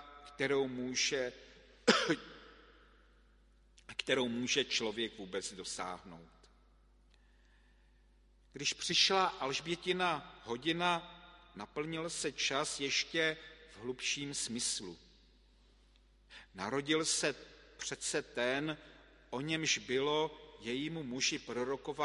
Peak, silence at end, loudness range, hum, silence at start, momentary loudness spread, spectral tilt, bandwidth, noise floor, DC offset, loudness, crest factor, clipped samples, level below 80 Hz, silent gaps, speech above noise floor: -10 dBFS; 0 s; 6 LU; 50 Hz at -65 dBFS; 0 s; 17 LU; -2.5 dB/octave; 11.5 kHz; -66 dBFS; under 0.1%; -35 LUFS; 28 dB; under 0.1%; -66 dBFS; none; 30 dB